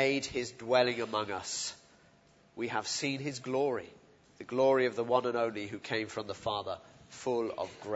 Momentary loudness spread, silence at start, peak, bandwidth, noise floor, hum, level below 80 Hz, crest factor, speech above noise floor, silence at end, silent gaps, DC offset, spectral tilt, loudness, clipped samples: 12 LU; 0 s; -14 dBFS; 8 kHz; -63 dBFS; none; -70 dBFS; 20 dB; 31 dB; 0 s; none; under 0.1%; -3.5 dB/octave; -33 LUFS; under 0.1%